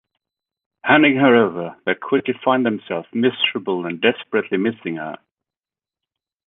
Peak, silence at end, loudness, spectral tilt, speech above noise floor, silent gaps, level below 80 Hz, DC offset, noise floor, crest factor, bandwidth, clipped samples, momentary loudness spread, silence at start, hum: -2 dBFS; 1.3 s; -19 LUFS; -9 dB/octave; over 72 dB; none; -66 dBFS; under 0.1%; under -90 dBFS; 20 dB; 4 kHz; under 0.1%; 14 LU; 0.85 s; none